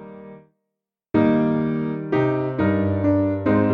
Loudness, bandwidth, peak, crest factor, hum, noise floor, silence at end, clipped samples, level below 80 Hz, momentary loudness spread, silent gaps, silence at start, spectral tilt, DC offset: -21 LUFS; 5.2 kHz; -6 dBFS; 16 dB; none; -83 dBFS; 0 s; under 0.1%; -50 dBFS; 6 LU; none; 0 s; -10.5 dB/octave; under 0.1%